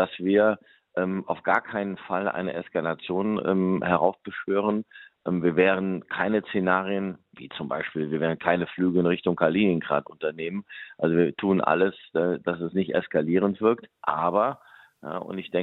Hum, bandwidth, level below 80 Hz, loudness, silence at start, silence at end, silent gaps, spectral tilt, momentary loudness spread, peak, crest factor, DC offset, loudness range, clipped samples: none; 4.1 kHz; -66 dBFS; -26 LUFS; 0 s; 0 s; none; -9.5 dB/octave; 11 LU; -4 dBFS; 20 dB; under 0.1%; 2 LU; under 0.1%